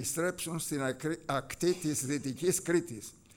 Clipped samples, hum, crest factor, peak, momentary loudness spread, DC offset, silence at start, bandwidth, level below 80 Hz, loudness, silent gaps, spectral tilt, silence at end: under 0.1%; none; 16 dB; -16 dBFS; 5 LU; under 0.1%; 0 s; 18.5 kHz; -62 dBFS; -33 LUFS; none; -4 dB/octave; 0.2 s